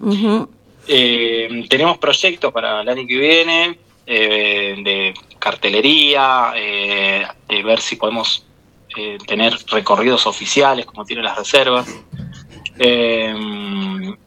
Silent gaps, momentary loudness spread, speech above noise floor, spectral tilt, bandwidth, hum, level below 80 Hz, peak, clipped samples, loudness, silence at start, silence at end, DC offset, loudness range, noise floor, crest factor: none; 14 LU; 24 dB; -3 dB/octave; 17 kHz; none; -56 dBFS; 0 dBFS; under 0.1%; -15 LUFS; 0 s; 0.1 s; under 0.1%; 4 LU; -40 dBFS; 16 dB